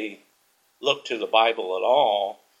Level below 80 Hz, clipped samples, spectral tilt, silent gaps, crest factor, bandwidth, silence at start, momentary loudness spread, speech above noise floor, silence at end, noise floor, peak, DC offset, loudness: -84 dBFS; under 0.1%; -2.5 dB/octave; none; 22 dB; 13 kHz; 0 s; 9 LU; 43 dB; 0.25 s; -65 dBFS; -4 dBFS; under 0.1%; -23 LUFS